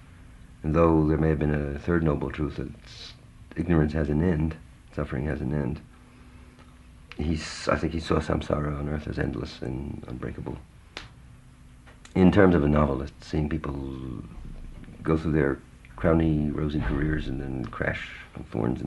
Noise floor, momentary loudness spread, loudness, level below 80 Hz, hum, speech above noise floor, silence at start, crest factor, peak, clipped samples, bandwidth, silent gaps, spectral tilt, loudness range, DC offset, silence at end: -50 dBFS; 20 LU; -27 LUFS; -38 dBFS; none; 24 dB; 0 s; 24 dB; -4 dBFS; under 0.1%; 11.5 kHz; none; -8 dB/octave; 7 LU; under 0.1%; 0 s